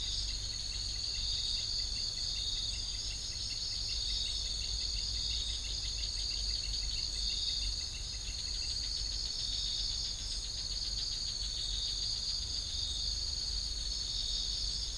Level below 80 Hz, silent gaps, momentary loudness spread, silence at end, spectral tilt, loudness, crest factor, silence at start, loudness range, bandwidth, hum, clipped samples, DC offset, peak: -44 dBFS; none; 3 LU; 0 s; -0.5 dB/octave; -34 LUFS; 14 dB; 0 s; 1 LU; 10.5 kHz; none; under 0.1%; under 0.1%; -22 dBFS